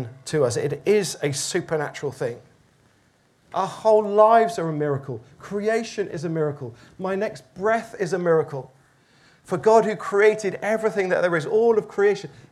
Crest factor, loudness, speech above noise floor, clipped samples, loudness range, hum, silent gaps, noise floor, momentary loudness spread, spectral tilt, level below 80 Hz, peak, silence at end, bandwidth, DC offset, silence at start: 20 dB; -22 LUFS; 39 dB; under 0.1%; 5 LU; none; none; -61 dBFS; 13 LU; -5 dB/octave; -66 dBFS; -4 dBFS; 0.2 s; 13.5 kHz; under 0.1%; 0 s